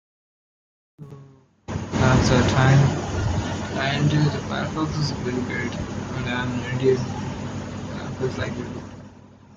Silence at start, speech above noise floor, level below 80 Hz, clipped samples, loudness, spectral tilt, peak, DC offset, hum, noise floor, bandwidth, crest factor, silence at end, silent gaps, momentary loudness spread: 1 s; 27 dB; -42 dBFS; under 0.1%; -23 LUFS; -6 dB/octave; -4 dBFS; under 0.1%; none; -49 dBFS; 7.8 kHz; 18 dB; 0.05 s; none; 15 LU